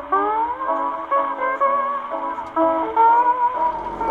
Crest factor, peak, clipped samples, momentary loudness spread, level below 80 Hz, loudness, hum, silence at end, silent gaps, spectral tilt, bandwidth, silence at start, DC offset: 14 dB; -6 dBFS; under 0.1%; 10 LU; -52 dBFS; -20 LUFS; none; 0 s; none; -6.5 dB/octave; 4.5 kHz; 0 s; under 0.1%